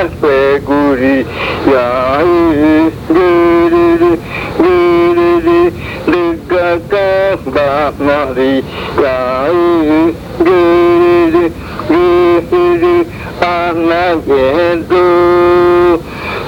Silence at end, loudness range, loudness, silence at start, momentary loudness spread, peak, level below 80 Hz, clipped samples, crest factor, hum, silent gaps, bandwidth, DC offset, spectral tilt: 0 s; 3 LU; -10 LUFS; 0 s; 6 LU; 0 dBFS; -34 dBFS; under 0.1%; 10 dB; none; none; 7.2 kHz; under 0.1%; -7 dB/octave